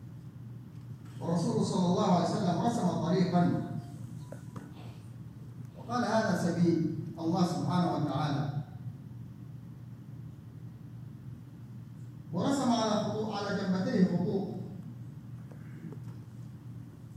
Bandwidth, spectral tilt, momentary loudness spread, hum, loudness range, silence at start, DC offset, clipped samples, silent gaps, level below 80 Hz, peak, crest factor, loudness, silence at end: 12 kHz; -7 dB/octave; 19 LU; none; 10 LU; 0 s; under 0.1%; under 0.1%; none; -66 dBFS; -14 dBFS; 18 dB; -31 LUFS; 0 s